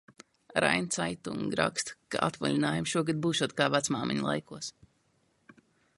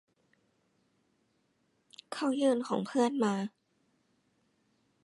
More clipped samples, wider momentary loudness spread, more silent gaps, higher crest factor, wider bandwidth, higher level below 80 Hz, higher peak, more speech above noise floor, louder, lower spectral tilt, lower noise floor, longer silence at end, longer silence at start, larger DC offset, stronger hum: neither; about the same, 8 LU vs 10 LU; neither; about the same, 24 dB vs 20 dB; about the same, 11.5 kHz vs 11.5 kHz; first, -64 dBFS vs -84 dBFS; first, -8 dBFS vs -16 dBFS; second, 41 dB vs 45 dB; about the same, -30 LUFS vs -31 LUFS; second, -4 dB/octave vs -5.5 dB/octave; about the same, -72 dBFS vs -75 dBFS; second, 1.25 s vs 1.55 s; second, 0.1 s vs 2.1 s; neither; neither